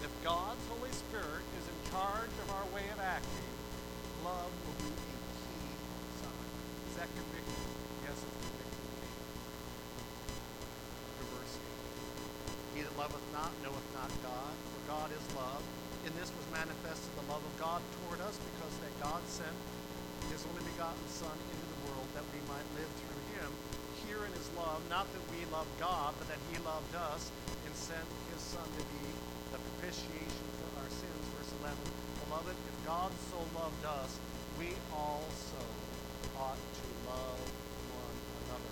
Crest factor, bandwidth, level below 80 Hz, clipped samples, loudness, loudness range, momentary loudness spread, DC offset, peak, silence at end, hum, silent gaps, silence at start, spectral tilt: 22 dB; over 20 kHz; -54 dBFS; under 0.1%; -43 LUFS; 4 LU; 7 LU; under 0.1%; -20 dBFS; 0 s; 60 Hz at -50 dBFS; none; 0 s; -4 dB/octave